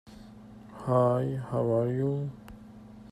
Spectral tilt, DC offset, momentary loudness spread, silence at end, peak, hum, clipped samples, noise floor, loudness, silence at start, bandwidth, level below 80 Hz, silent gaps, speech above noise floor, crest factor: -9.5 dB/octave; under 0.1%; 24 LU; 0.05 s; -12 dBFS; none; under 0.1%; -49 dBFS; -29 LUFS; 0.05 s; 11 kHz; -58 dBFS; none; 22 dB; 18 dB